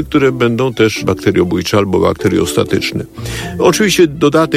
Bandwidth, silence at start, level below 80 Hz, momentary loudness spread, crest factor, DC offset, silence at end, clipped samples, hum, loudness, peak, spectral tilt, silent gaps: 16.5 kHz; 0 s; -38 dBFS; 9 LU; 12 dB; under 0.1%; 0 s; under 0.1%; none; -13 LUFS; 0 dBFS; -5 dB/octave; none